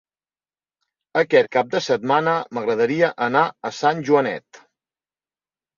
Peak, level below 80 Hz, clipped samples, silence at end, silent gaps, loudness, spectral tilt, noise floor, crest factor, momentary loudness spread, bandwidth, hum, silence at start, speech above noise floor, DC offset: -2 dBFS; -68 dBFS; under 0.1%; 1.4 s; none; -20 LUFS; -5 dB/octave; under -90 dBFS; 20 dB; 6 LU; 7.2 kHz; none; 1.15 s; over 71 dB; under 0.1%